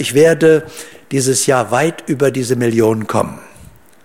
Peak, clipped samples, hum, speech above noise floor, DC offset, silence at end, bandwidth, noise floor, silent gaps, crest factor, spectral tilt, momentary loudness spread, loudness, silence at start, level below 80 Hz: -2 dBFS; under 0.1%; none; 29 dB; 0.5%; 0.6 s; 16.5 kHz; -42 dBFS; none; 14 dB; -4.5 dB/octave; 10 LU; -14 LUFS; 0 s; -52 dBFS